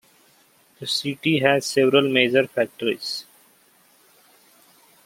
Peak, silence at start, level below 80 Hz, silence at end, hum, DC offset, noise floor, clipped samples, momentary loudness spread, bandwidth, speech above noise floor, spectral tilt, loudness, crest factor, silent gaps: -2 dBFS; 0.8 s; -70 dBFS; 1.85 s; none; under 0.1%; -58 dBFS; under 0.1%; 11 LU; 16.5 kHz; 37 dB; -4 dB/octave; -21 LUFS; 22 dB; none